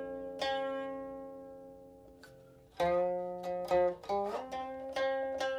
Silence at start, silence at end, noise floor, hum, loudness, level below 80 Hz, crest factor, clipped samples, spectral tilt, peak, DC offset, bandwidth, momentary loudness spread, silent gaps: 0 s; 0 s; -58 dBFS; none; -35 LUFS; -64 dBFS; 16 dB; under 0.1%; -5 dB/octave; -20 dBFS; under 0.1%; 13.5 kHz; 24 LU; none